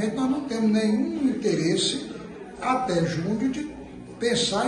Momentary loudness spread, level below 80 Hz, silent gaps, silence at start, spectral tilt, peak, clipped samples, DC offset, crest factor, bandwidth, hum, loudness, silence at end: 14 LU; -54 dBFS; none; 0 s; -4.5 dB/octave; -10 dBFS; under 0.1%; under 0.1%; 16 dB; 11 kHz; none; -25 LUFS; 0 s